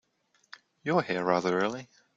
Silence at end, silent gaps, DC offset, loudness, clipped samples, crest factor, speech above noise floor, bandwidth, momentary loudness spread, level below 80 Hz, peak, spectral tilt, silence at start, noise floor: 0.3 s; none; under 0.1%; -29 LUFS; under 0.1%; 20 dB; 43 dB; 7.8 kHz; 11 LU; -72 dBFS; -10 dBFS; -6 dB/octave; 0.85 s; -71 dBFS